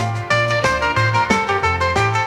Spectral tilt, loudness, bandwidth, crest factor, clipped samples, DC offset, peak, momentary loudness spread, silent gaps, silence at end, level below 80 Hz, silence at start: -4.5 dB/octave; -17 LUFS; 13 kHz; 16 dB; under 0.1%; under 0.1%; -2 dBFS; 2 LU; none; 0 s; -40 dBFS; 0 s